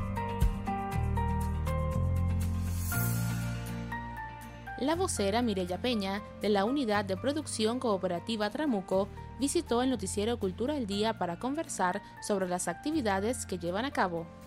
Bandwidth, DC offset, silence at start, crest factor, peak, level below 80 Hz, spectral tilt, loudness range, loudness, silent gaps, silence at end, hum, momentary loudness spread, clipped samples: 16 kHz; under 0.1%; 0 s; 16 dB; -14 dBFS; -44 dBFS; -5.5 dB/octave; 2 LU; -32 LUFS; none; 0 s; none; 6 LU; under 0.1%